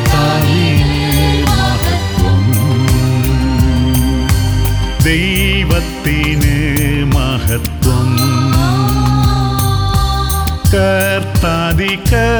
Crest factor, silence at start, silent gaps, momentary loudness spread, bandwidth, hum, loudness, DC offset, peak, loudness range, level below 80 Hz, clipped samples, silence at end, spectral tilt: 12 dB; 0 s; none; 3 LU; over 20 kHz; none; -13 LUFS; under 0.1%; 0 dBFS; 1 LU; -18 dBFS; under 0.1%; 0 s; -5.5 dB/octave